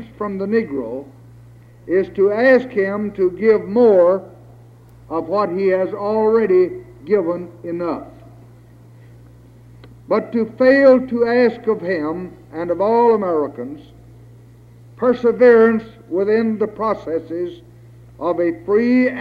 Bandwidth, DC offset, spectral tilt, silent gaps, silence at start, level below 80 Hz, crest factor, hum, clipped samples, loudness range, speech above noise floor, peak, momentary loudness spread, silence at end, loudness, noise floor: 5.4 kHz; under 0.1%; -8.5 dB/octave; none; 0 s; -54 dBFS; 16 dB; none; under 0.1%; 5 LU; 27 dB; -2 dBFS; 14 LU; 0 s; -17 LUFS; -44 dBFS